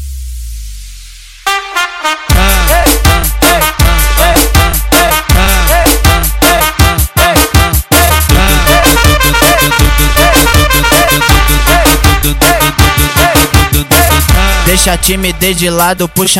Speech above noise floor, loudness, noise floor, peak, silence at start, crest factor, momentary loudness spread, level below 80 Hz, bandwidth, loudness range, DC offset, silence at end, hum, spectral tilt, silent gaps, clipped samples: 20 dB; -7 LUFS; -30 dBFS; 0 dBFS; 0 s; 8 dB; 6 LU; -12 dBFS; 17.5 kHz; 2 LU; under 0.1%; 0 s; none; -3.5 dB/octave; none; 0.6%